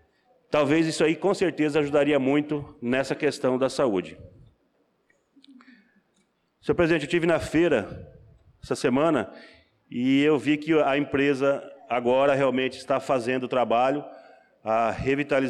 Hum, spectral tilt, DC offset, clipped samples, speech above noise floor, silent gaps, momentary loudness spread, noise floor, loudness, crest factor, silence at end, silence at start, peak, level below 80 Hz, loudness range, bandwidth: none; -6 dB/octave; under 0.1%; under 0.1%; 46 dB; none; 9 LU; -69 dBFS; -24 LUFS; 14 dB; 0 s; 0.5 s; -12 dBFS; -56 dBFS; 6 LU; 12 kHz